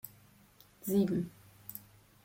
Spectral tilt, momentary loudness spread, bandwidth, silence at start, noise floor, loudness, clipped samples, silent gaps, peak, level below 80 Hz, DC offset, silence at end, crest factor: -7 dB/octave; 19 LU; 16.5 kHz; 0.05 s; -62 dBFS; -34 LUFS; under 0.1%; none; -18 dBFS; -68 dBFS; under 0.1%; 0.45 s; 20 dB